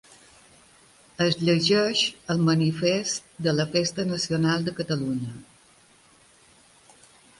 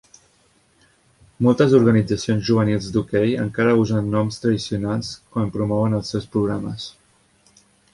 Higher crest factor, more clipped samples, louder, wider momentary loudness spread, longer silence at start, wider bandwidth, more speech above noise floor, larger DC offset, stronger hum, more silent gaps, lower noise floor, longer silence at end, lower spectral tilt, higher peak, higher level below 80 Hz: about the same, 18 dB vs 18 dB; neither; second, -24 LUFS vs -20 LUFS; about the same, 9 LU vs 11 LU; second, 1.2 s vs 1.4 s; about the same, 11.5 kHz vs 11.5 kHz; second, 33 dB vs 40 dB; neither; neither; neither; about the same, -57 dBFS vs -59 dBFS; first, 1.95 s vs 1.05 s; second, -5 dB/octave vs -7 dB/octave; second, -8 dBFS vs -2 dBFS; second, -62 dBFS vs -48 dBFS